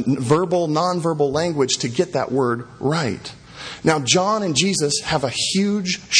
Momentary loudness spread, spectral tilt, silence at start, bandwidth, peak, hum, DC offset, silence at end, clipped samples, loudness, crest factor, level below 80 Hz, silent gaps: 6 LU; -4 dB/octave; 0 s; 10.5 kHz; 0 dBFS; none; under 0.1%; 0 s; under 0.1%; -20 LUFS; 20 dB; -52 dBFS; none